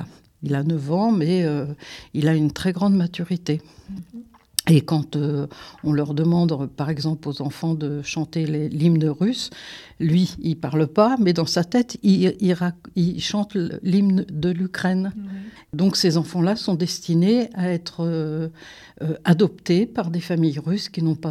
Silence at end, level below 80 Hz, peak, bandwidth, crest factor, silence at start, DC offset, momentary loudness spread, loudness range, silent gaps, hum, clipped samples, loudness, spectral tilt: 0 s; -56 dBFS; 0 dBFS; 14 kHz; 22 dB; 0 s; under 0.1%; 13 LU; 3 LU; none; none; under 0.1%; -22 LUFS; -6.5 dB/octave